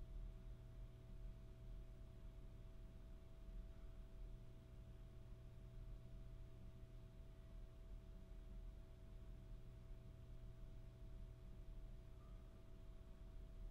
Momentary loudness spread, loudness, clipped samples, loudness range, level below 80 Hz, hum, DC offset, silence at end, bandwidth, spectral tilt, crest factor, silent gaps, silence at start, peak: 3 LU; -62 LUFS; under 0.1%; 1 LU; -58 dBFS; none; under 0.1%; 0 s; 15 kHz; -7.5 dB/octave; 12 dB; none; 0 s; -44 dBFS